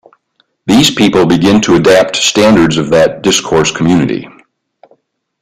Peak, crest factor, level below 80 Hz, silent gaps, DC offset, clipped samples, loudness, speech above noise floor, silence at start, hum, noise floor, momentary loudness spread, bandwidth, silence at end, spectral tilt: 0 dBFS; 10 dB; -40 dBFS; none; under 0.1%; under 0.1%; -9 LUFS; 50 dB; 0.65 s; none; -58 dBFS; 5 LU; 16 kHz; 1.15 s; -4.5 dB/octave